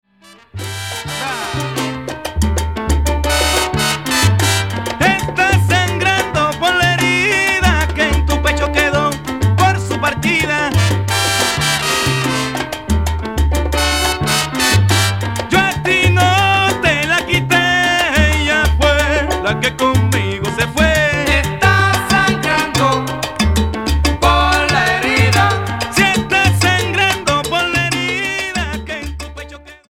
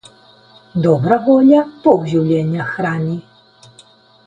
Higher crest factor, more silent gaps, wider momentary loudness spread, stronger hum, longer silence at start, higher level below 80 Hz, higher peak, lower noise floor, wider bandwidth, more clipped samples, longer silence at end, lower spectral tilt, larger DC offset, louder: about the same, 14 dB vs 16 dB; neither; second, 8 LU vs 12 LU; neither; second, 0.55 s vs 0.75 s; first, -24 dBFS vs -54 dBFS; about the same, 0 dBFS vs 0 dBFS; about the same, -45 dBFS vs -47 dBFS; first, 17 kHz vs 9.2 kHz; neither; second, 0.15 s vs 1.05 s; second, -4 dB/octave vs -8.5 dB/octave; first, 0.3% vs under 0.1%; about the same, -14 LUFS vs -15 LUFS